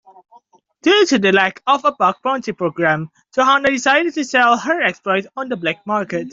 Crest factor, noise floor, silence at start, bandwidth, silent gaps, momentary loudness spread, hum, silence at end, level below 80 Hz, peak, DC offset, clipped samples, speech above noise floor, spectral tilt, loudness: 16 dB; -51 dBFS; 0.85 s; 7.8 kHz; none; 8 LU; none; 0 s; -60 dBFS; -2 dBFS; under 0.1%; under 0.1%; 34 dB; -4 dB/octave; -16 LUFS